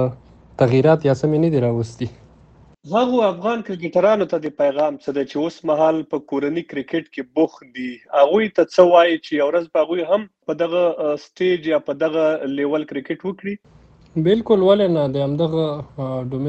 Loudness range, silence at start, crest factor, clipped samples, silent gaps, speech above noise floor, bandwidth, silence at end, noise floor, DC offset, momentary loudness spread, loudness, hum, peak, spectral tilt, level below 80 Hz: 4 LU; 0 s; 18 dB; under 0.1%; none; 31 dB; 8.4 kHz; 0 s; -49 dBFS; under 0.1%; 12 LU; -19 LUFS; none; 0 dBFS; -7.5 dB/octave; -56 dBFS